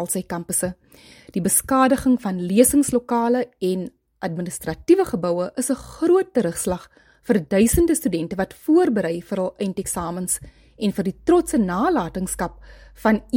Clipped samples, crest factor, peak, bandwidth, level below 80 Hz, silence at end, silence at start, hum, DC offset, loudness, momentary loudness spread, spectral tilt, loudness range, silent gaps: under 0.1%; 20 dB; -2 dBFS; 17 kHz; -44 dBFS; 0 s; 0 s; none; under 0.1%; -21 LUFS; 11 LU; -5 dB/octave; 3 LU; none